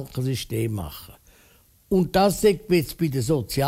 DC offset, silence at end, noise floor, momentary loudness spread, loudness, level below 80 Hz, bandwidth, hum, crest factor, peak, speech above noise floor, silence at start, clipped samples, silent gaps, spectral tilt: under 0.1%; 0 s; -57 dBFS; 11 LU; -23 LUFS; -46 dBFS; 16 kHz; none; 16 dB; -8 dBFS; 34 dB; 0 s; under 0.1%; none; -6 dB/octave